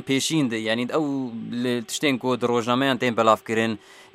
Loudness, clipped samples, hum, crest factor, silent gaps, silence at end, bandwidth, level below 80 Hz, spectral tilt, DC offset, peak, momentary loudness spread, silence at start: -23 LUFS; under 0.1%; none; 20 dB; none; 0.1 s; 16 kHz; -70 dBFS; -4.5 dB/octave; under 0.1%; -4 dBFS; 7 LU; 0 s